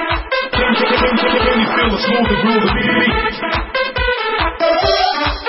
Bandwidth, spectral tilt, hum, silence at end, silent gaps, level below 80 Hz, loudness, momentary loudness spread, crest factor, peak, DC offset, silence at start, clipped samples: 6 kHz; -7.5 dB/octave; none; 0 s; none; -28 dBFS; -14 LUFS; 4 LU; 14 dB; -2 dBFS; under 0.1%; 0 s; under 0.1%